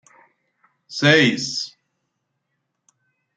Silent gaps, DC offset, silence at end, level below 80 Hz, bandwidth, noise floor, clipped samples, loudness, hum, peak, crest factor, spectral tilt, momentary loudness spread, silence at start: none; under 0.1%; 1.7 s; -64 dBFS; 9.4 kHz; -76 dBFS; under 0.1%; -17 LUFS; none; 0 dBFS; 22 dB; -4 dB/octave; 19 LU; 0.9 s